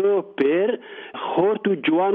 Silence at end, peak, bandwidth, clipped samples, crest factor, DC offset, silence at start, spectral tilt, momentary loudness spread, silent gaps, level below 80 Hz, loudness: 0 s; -8 dBFS; 4.1 kHz; under 0.1%; 14 dB; under 0.1%; 0 s; -4 dB/octave; 11 LU; none; -70 dBFS; -22 LUFS